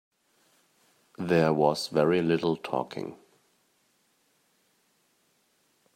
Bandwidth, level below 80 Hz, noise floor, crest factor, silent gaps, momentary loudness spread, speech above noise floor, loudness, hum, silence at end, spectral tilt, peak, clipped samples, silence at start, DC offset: 16 kHz; -70 dBFS; -70 dBFS; 22 dB; none; 14 LU; 44 dB; -27 LUFS; none; 2.8 s; -6 dB/octave; -8 dBFS; under 0.1%; 1.2 s; under 0.1%